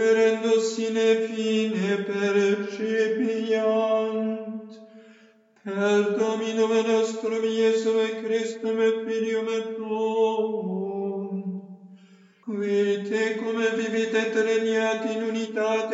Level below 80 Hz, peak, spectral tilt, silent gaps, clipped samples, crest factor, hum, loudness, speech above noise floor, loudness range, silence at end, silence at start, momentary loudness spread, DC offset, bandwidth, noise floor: under -90 dBFS; -10 dBFS; -5 dB/octave; none; under 0.1%; 14 dB; none; -25 LUFS; 33 dB; 4 LU; 0 s; 0 s; 8 LU; under 0.1%; 8 kHz; -57 dBFS